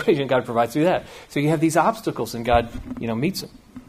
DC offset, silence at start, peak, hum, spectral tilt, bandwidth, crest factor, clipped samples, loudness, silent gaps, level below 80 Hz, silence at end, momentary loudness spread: under 0.1%; 0 s; -4 dBFS; none; -6 dB/octave; 15.5 kHz; 18 dB; under 0.1%; -22 LUFS; none; -42 dBFS; 0.05 s; 11 LU